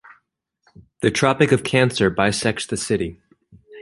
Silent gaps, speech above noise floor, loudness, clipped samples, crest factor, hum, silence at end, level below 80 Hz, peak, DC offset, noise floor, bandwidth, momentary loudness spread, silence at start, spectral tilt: none; 50 dB; -19 LUFS; under 0.1%; 20 dB; none; 0 s; -48 dBFS; -2 dBFS; under 0.1%; -69 dBFS; 11.5 kHz; 7 LU; 1 s; -5 dB/octave